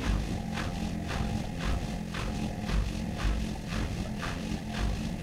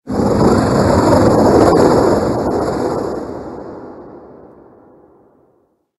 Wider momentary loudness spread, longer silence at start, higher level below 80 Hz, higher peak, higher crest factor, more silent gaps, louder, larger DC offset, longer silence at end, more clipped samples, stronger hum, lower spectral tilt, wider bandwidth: second, 2 LU vs 19 LU; about the same, 0 s vs 0.05 s; about the same, -36 dBFS vs -34 dBFS; second, -18 dBFS vs 0 dBFS; about the same, 14 dB vs 14 dB; neither; second, -34 LUFS vs -13 LUFS; neither; second, 0 s vs 1.75 s; neither; neither; second, -5.5 dB/octave vs -7 dB/octave; first, 15 kHz vs 12.5 kHz